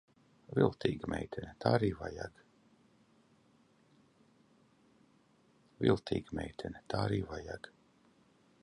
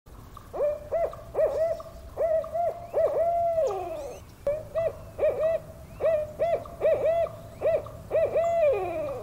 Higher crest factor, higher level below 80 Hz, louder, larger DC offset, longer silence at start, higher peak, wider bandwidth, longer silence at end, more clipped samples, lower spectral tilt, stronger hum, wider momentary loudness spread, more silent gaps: first, 26 dB vs 14 dB; second, -58 dBFS vs -50 dBFS; second, -36 LUFS vs -28 LUFS; neither; first, 0.5 s vs 0.05 s; about the same, -14 dBFS vs -14 dBFS; second, 11.5 kHz vs 16 kHz; first, 0.95 s vs 0 s; neither; about the same, -7.5 dB/octave vs -6.5 dB/octave; neither; first, 15 LU vs 10 LU; neither